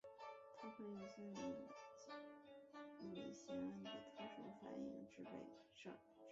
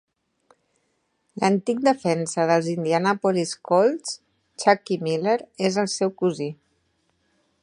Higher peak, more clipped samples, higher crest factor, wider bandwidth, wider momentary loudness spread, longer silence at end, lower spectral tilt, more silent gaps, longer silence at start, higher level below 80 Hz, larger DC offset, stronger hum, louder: second, -40 dBFS vs -2 dBFS; neither; second, 16 dB vs 22 dB; second, 7.6 kHz vs 11 kHz; about the same, 9 LU vs 9 LU; second, 0 s vs 1.1 s; about the same, -4.5 dB/octave vs -5 dB/octave; neither; second, 0.05 s vs 1.35 s; second, -86 dBFS vs -72 dBFS; neither; neither; second, -55 LUFS vs -23 LUFS